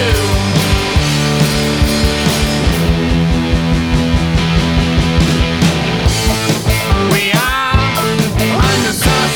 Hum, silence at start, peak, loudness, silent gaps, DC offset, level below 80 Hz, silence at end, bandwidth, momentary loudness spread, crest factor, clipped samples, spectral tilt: none; 0 s; 0 dBFS; -13 LUFS; none; under 0.1%; -20 dBFS; 0 s; over 20 kHz; 2 LU; 12 dB; under 0.1%; -4.5 dB/octave